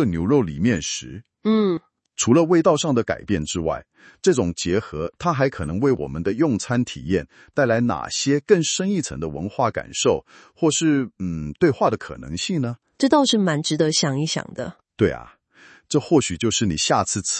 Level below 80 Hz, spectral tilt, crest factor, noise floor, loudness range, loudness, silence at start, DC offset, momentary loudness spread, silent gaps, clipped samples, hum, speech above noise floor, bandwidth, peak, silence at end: -50 dBFS; -4.5 dB/octave; 20 dB; -51 dBFS; 2 LU; -21 LUFS; 0 s; under 0.1%; 10 LU; none; under 0.1%; none; 30 dB; 8.8 kHz; -2 dBFS; 0 s